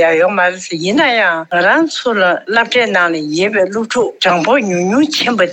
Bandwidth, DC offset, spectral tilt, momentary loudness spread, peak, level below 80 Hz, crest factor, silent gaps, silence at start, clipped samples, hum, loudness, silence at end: 18 kHz; under 0.1%; -4 dB/octave; 4 LU; -2 dBFS; -60 dBFS; 12 dB; none; 0 s; under 0.1%; none; -13 LUFS; 0 s